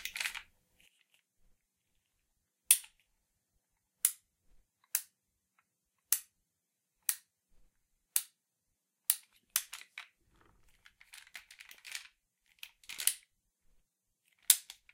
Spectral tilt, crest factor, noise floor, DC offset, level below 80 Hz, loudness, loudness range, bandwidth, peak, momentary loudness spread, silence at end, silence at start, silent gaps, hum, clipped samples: 4.5 dB/octave; 36 dB; -85 dBFS; under 0.1%; -78 dBFS; -33 LUFS; 7 LU; 16.5 kHz; -4 dBFS; 24 LU; 0.2 s; 0 s; none; none; under 0.1%